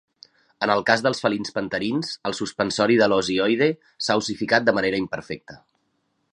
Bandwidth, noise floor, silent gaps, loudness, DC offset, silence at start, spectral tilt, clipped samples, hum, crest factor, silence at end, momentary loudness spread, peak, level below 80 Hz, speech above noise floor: 11 kHz; -71 dBFS; none; -22 LUFS; under 0.1%; 0.6 s; -4.5 dB/octave; under 0.1%; none; 22 dB; 0.75 s; 10 LU; -2 dBFS; -60 dBFS; 49 dB